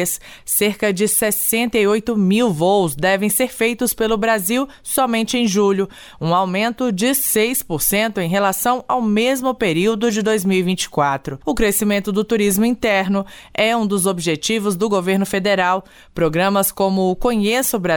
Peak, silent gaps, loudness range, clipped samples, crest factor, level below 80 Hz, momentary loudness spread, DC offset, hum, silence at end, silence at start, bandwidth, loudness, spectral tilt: -6 dBFS; none; 2 LU; under 0.1%; 12 dB; -42 dBFS; 4 LU; under 0.1%; none; 0 s; 0 s; over 20 kHz; -17 LUFS; -4 dB/octave